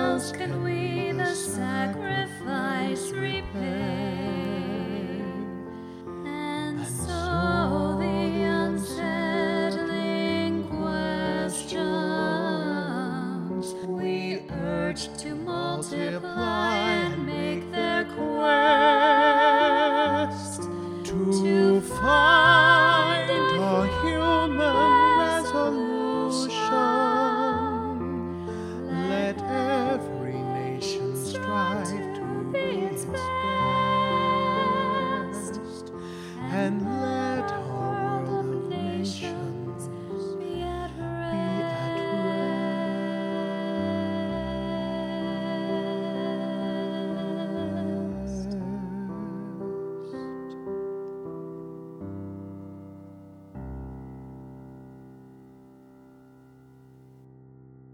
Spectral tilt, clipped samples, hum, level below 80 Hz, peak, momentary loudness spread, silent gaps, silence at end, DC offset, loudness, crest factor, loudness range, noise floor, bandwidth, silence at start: -5 dB/octave; under 0.1%; none; -50 dBFS; -4 dBFS; 15 LU; none; 0.7 s; under 0.1%; -26 LUFS; 22 dB; 14 LU; -52 dBFS; 14.5 kHz; 0 s